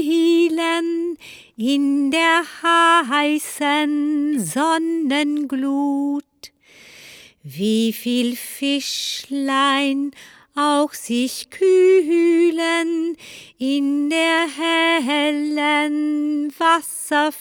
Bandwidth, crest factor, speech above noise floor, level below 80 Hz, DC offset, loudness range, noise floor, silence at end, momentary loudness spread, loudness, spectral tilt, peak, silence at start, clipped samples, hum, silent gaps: 19.5 kHz; 16 dB; 29 dB; -70 dBFS; under 0.1%; 5 LU; -47 dBFS; 0 s; 10 LU; -19 LUFS; -3 dB/octave; -4 dBFS; 0 s; under 0.1%; none; none